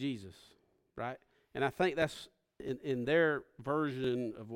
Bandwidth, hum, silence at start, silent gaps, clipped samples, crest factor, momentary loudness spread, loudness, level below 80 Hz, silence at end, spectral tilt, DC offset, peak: 16.5 kHz; none; 0 s; none; under 0.1%; 20 dB; 20 LU; -35 LUFS; -68 dBFS; 0 s; -6 dB/octave; under 0.1%; -16 dBFS